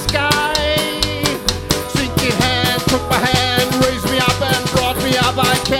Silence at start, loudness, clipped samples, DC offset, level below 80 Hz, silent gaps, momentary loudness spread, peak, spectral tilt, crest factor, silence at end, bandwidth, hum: 0 s; -15 LUFS; under 0.1%; under 0.1%; -32 dBFS; none; 4 LU; 0 dBFS; -3.5 dB/octave; 16 dB; 0 s; over 20 kHz; none